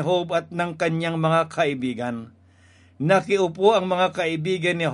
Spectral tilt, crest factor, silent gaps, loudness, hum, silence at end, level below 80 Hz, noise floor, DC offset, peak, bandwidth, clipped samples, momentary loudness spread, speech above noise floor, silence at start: -6 dB/octave; 20 dB; none; -22 LUFS; none; 0 s; -68 dBFS; -54 dBFS; under 0.1%; -4 dBFS; 11.5 kHz; under 0.1%; 9 LU; 32 dB; 0 s